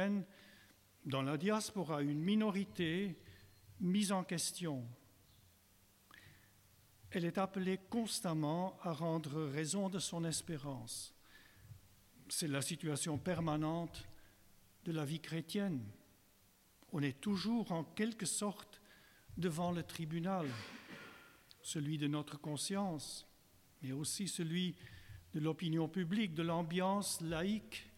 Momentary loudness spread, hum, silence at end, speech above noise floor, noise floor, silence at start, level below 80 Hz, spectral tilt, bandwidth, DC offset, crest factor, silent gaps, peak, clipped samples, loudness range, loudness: 16 LU; none; 0 s; 30 dB; -70 dBFS; 0 s; -70 dBFS; -5 dB/octave; 17 kHz; under 0.1%; 16 dB; none; -26 dBFS; under 0.1%; 4 LU; -40 LUFS